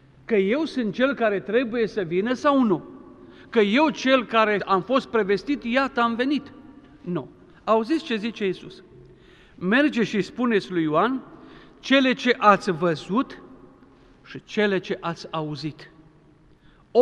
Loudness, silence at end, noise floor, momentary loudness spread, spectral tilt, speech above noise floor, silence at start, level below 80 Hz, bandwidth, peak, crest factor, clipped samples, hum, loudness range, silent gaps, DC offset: -23 LUFS; 0 s; -54 dBFS; 13 LU; -6 dB/octave; 32 dB; 0.3 s; -60 dBFS; 9.8 kHz; -2 dBFS; 22 dB; under 0.1%; none; 7 LU; none; under 0.1%